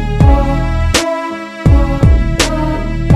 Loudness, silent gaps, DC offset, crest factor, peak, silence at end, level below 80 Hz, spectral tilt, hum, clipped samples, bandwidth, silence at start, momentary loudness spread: -13 LUFS; none; under 0.1%; 12 dB; 0 dBFS; 0 s; -14 dBFS; -5.5 dB/octave; none; 0.2%; 13.5 kHz; 0 s; 7 LU